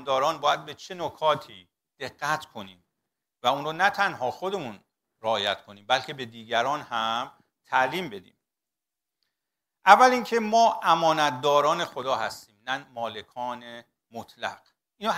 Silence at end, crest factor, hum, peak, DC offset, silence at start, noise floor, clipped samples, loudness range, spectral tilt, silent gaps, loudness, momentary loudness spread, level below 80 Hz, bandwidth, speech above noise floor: 0 s; 26 dB; none; 0 dBFS; under 0.1%; 0 s; -89 dBFS; under 0.1%; 9 LU; -3.5 dB/octave; none; -25 LUFS; 18 LU; -72 dBFS; 16 kHz; 63 dB